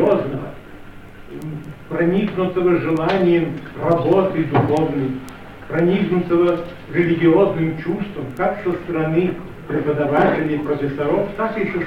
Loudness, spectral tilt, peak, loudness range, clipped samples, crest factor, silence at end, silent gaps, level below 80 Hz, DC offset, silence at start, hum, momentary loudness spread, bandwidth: -19 LUFS; -8.5 dB/octave; -2 dBFS; 2 LU; under 0.1%; 16 dB; 0 s; none; -46 dBFS; 0.6%; 0 s; none; 15 LU; 8.2 kHz